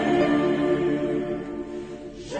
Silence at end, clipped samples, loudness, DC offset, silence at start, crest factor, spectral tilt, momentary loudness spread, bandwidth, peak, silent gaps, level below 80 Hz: 0 s; under 0.1%; -25 LUFS; under 0.1%; 0 s; 14 dB; -6.5 dB/octave; 15 LU; 9 kHz; -10 dBFS; none; -50 dBFS